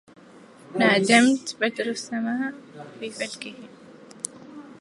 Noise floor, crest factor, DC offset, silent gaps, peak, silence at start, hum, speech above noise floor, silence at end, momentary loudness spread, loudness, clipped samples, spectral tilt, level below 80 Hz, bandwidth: -49 dBFS; 22 dB; under 0.1%; none; -2 dBFS; 0.7 s; none; 25 dB; 0.05 s; 25 LU; -23 LUFS; under 0.1%; -3.5 dB/octave; -76 dBFS; 11.5 kHz